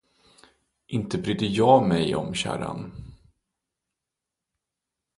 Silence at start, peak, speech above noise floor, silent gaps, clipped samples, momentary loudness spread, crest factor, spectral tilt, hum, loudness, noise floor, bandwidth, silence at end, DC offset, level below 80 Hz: 0.9 s; -4 dBFS; 63 dB; none; under 0.1%; 17 LU; 24 dB; -6 dB/octave; none; -24 LUFS; -86 dBFS; 11.5 kHz; 2.05 s; under 0.1%; -54 dBFS